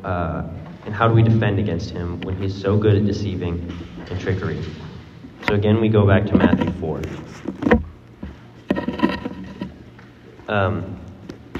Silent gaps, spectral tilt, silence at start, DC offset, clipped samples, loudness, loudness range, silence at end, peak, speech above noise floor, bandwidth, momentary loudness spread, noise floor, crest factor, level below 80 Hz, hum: none; -8.5 dB/octave; 0 s; under 0.1%; under 0.1%; -20 LUFS; 6 LU; 0 s; 0 dBFS; 24 dB; 7.2 kHz; 21 LU; -43 dBFS; 20 dB; -42 dBFS; none